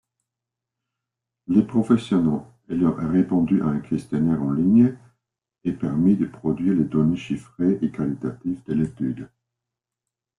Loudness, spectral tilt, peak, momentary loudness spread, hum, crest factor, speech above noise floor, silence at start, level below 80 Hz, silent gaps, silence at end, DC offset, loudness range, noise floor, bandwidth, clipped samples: -22 LUFS; -9 dB/octave; -6 dBFS; 10 LU; none; 18 dB; 65 dB; 1.5 s; -54 dBFS; none; 1.15 s; under 0.1%; 3 LU; -86 dBFS; 10.5 kHz; under 0.1%